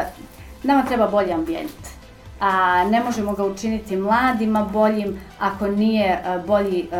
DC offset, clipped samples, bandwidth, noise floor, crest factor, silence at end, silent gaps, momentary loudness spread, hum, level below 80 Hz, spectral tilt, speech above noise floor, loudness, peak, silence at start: 0.1%; under 0.1%; 16.5 kHz; -40 dBFS; 14 dB; 0 s; none; 11 LU; none; -44 dBFS; -6 dB/octave; 21 dB; -20 LUFS; -6 dBFS; 0 s